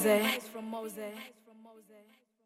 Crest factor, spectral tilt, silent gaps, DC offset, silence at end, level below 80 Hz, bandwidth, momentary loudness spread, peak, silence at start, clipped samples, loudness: 20 dB; -3.5 dB/octave; none; under 0.1%; 0.45 s; -82 dBFS; 16.5 kHz; 19 LU; -16 dBFS; 0 s; under 0.1%; -34 LUFS